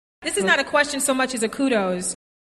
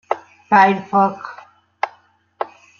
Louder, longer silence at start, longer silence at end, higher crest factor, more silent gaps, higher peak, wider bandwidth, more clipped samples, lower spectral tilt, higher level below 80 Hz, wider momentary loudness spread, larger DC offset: second, -21 LUFS vs -17 LUFS; about the same, 0.2 s vs 0.1 s; about the same, 0.3 s vs 0.35 s; about the same, 16 dB vs 18 dB; neither; second, -6 dBFS vs -2 dBFS; first, 13 kHz vs 7 kHz; neither; second, -2.5 dB/octave vs -6.5 dB/octave; first, -58 dBFS vs -70 dBFS; second, 8 LU vs 17 LU; neither